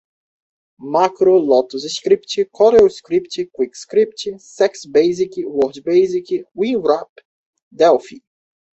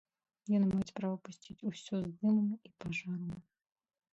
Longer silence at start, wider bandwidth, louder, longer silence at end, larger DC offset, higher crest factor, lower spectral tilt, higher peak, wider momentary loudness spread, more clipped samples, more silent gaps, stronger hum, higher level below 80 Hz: first, 0.8 s vs 0.45 s; about the same, 8.2 kHz vs 8 kHz; first, -17 LUFS vs -36 LUFS; second, 0.6 s vs 0.75 s; neither; about the same, 16 dB vs 14 dB; second, -5 dB/octave vs -7 dB/octave; first, -2 dBFS vs -22 dBFS; second, 10 LU vs 14 LU; neither; first, 7.09-7.16 s, 7.25-7.53 s, 7.62-7.71 s vs none; neither; first, -58 dBFS vs -68 dBFS